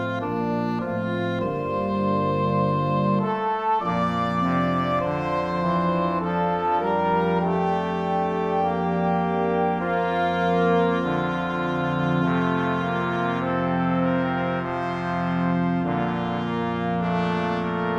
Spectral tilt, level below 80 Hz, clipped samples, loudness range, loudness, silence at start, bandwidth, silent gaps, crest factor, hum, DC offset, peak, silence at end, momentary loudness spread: -8.5 dB/octave; -52 dBFS; under 0.1%; 2 LU; -24 LUFS; 0 s; 7 kHz; none; 14 dB; none; under 0.1%; -10 dBFS; 0 s; 4 LU